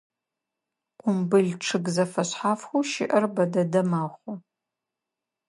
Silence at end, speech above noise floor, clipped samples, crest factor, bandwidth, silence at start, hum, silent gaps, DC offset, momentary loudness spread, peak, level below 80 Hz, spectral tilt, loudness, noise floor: 1.1 s; 62 dB; under 0.1%; 18 dB; 11.5 kHz; 1.05 s; none; none; under 0.1%; 10 LU; -8 dBFS; -74 dBFS; -5.5 dB/octave; -25 LUFS; -87 dBFS